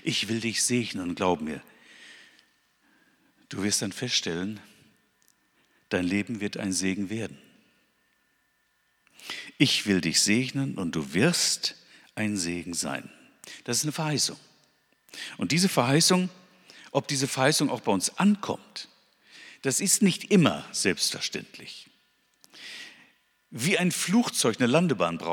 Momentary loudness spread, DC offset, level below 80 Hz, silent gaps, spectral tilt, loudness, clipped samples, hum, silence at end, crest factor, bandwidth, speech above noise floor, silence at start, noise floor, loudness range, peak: 18 LU; under 0.1%; -68 dBFS; none; -3.5 dB/octave; -26 LUFS; under 0.1%; none; 0 s; 24 dB; 18.5 kHz; 44 dB; 0.05 s; -71 dBFS; 7 LU; -4 dBFS